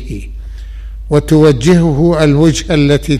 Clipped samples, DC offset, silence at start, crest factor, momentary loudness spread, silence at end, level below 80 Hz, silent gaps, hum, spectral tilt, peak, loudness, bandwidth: under 0.1%; under 0.1%; 0 s; 10 dB; 21 LU; 0 s; -24 dBFS; none; none; -6.5 dB/octave; 0 dBFS; -10 LUFS; 14.5 kHz